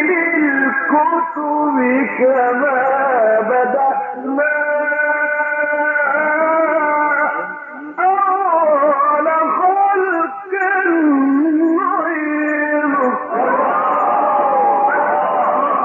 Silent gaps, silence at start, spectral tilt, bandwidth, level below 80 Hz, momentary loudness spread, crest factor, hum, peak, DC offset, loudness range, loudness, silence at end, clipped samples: none; 0 s; -8.5 dB/octave; 3.3 kHz; -74 dBFS; 4 LU; 12 dB; none; -4 dBFS; under 0.1%; 1 LU; -15 LUFS; 0 s; under 0.1%